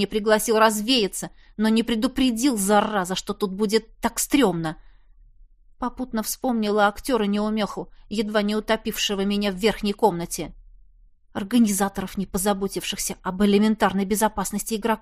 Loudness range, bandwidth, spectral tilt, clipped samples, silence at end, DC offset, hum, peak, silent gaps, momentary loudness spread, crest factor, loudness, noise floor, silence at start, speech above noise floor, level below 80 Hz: 4 LU; 15.5 kHz; -4 dB/octave; under 0.1%; 0.05 s; under 0.1%; none; -6 dBFS; none; 11 LU; 18 dB; -23 LUFS; -53 dBFS; 0 s; 30 dB; -46 dBFS